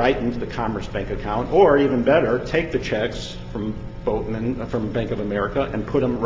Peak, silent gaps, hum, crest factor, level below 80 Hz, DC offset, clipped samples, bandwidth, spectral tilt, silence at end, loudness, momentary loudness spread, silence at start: -2 dBFS; none; none; 18 dB; -36 dBFS; under 0.1%; under 0.1%; 7.6 kHz; -7 dB/octave; 0 s; -22 LUFS; 12 LU; 0 s